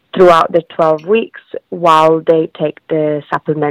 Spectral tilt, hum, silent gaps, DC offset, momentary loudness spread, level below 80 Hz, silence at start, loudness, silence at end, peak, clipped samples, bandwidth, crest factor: -6.5 dB/octave; none; none; under 0.1%; 12 LU; -52 dBFS; 0.15 s; -12 LUFS; 0 s; 0 dBFS; under 0.1%; 13.5 kHz; 12 dB